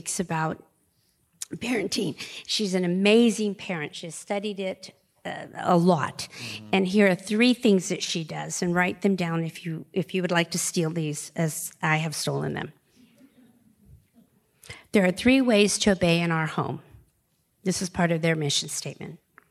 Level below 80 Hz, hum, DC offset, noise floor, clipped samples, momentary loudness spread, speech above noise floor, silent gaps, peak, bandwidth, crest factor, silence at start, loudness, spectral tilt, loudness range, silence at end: -60 dBFS; none; under 0.1%; -70 dBFS; under 0.1%; 16 LU; 45 dB; none; -6 dBFS; 15 kHz; 20 dB; 0.05 s; -25 LUFS; -4.5 dB/octave; 5 LU; 0.35 s